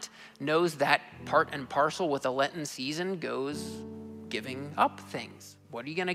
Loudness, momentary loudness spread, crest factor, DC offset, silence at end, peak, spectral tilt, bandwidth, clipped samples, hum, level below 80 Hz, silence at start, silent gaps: -31 LUFS; 16 LU; 24 dB; under 0.1%; 0 s; -8 dBFS; -4.5 dB/octave; 16 kHz; under 0.1%; none; -70 dBFS; 0 s; none